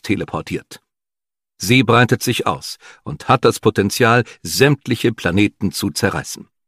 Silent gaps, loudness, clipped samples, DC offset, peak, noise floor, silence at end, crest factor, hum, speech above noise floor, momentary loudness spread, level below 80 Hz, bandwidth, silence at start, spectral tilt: none; -17 LUFS; under 0.1%; under 0.1%; 0 dBFS; under -90 dBFS; 0.3 s; 18 dB; none; over 73 dB; 14 LU; -50 dBFS; 15.5 kHz; 0.05 s; -5 dB/octave